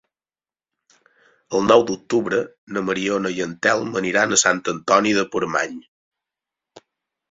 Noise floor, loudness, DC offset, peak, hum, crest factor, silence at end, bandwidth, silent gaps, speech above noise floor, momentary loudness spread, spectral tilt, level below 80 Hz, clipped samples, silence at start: under -90 dBFS; -20 LUFS; under 0.1%; -2 dBFS; none; 20 dB; 0.5 s; 7.8 kHz; 2.58-2.67 s, 5.88-6.11 s; over 70 dB; 10 LU; -3 dB/octave; -60 dBFS; under 0.1%; 1.5 s